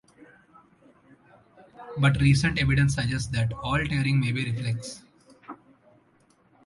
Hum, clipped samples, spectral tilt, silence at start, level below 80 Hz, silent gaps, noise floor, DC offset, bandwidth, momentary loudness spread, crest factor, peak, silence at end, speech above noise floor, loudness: none; under 0.1%; -5.5 dB/octave; 1.8 s; -44 dBFS; none; -63 dBFS; under 0.1%; 11.5 kHz; 24 LU; 20 dB; -6 dBFS; 1.1 s; 39 dB; -25 LUFS